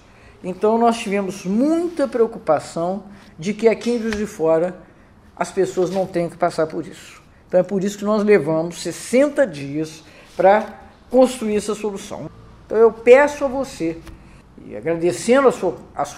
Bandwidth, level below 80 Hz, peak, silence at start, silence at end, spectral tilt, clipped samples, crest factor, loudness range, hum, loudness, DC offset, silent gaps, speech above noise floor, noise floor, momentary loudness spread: 15 kHz; -50 dBFS; 0 dBFS; 0.45 s; 0 s; -5.5 dB/octave; under 0.1%; 20 dB; 4 LU; none; -19 LUFS; under 0.1%; none; 29 dB; -48 dBFS; 15 LU